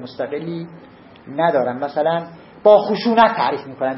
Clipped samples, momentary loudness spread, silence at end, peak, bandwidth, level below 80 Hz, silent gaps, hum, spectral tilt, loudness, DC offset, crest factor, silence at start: under 0.1%; 17 LU; 0 s; 0 dBFS; 5.8 kHz; -60 dBFS; none; none; -9.5 dB/octave; -17 LUFS; under 0.1%; 18 dB; 0 s